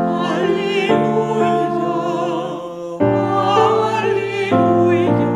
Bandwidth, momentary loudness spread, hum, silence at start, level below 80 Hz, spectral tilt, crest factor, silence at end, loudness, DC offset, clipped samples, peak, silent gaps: 10 kHz; 7 LU; none; 0 s; -54 dBFS; -7 dB/octave; 16 dB; 0 s; -17 LUFS; under 0.1%; under 0.1%; 0 dBFS; none